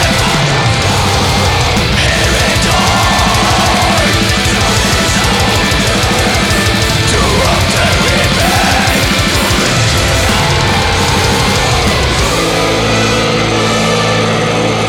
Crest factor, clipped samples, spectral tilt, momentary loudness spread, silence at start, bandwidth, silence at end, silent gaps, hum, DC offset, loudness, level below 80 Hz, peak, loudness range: 10 dB; under 0.1%; -3.5 dB/octave; 2 LU; 0 s; 18.5 kHz; 0 s; none; none; under 0.1%; -10 LUFS; -22 dBFS; 0 dBFS; 1 LU